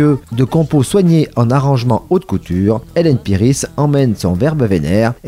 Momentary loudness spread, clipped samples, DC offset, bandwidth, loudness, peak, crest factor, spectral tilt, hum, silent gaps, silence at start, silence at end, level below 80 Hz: 3 LU; under 0.1%; under 0.1%; 15.5 kHz; -14 LUFS; 0 dBFS; 12 dB; -7 dB/octave; none; none; 0 s; 0 s; -38 dBFS